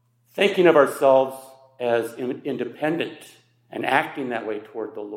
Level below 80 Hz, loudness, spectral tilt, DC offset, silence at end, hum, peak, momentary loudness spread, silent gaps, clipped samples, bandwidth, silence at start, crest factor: -78 dBFS; -22 LUFS; -5 dB/octave; under 0.1%; 0 s; none; -2 dBFS; 16 LU; none; under 0.1%; 16 kHz; 0.35 s; 20 dB